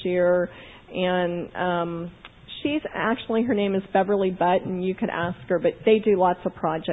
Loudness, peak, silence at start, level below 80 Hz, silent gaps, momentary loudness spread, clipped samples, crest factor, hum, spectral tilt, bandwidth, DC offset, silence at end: -24 LUFS; -6 dBFS; 0 s; -54 dBFS; none; 10 LU; under 0.1%; 18 dB; none; -9.5 dB/octave; 4 kHz; under 0.1%; 0 s